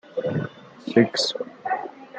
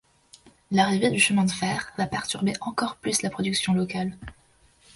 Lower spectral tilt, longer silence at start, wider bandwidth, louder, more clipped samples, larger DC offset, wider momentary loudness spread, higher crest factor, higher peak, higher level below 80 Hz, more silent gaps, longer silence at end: about the same, -5 dB/octave vs -4 dB/octave; second, 0.1 s vs 0.7 s; second, 9.4 kHz vs 11.5 kHz; about the same, -24 LUFS vs -25 LUFS; neither; neither; first, 13 LU vs 9 LU; about the same, 22 dB vs 18 dB; first, -4 dBFS vs -8 dBFS; second, -70 dBFS vs -56 dBFS; neither; second, 0 s vs 0.65 s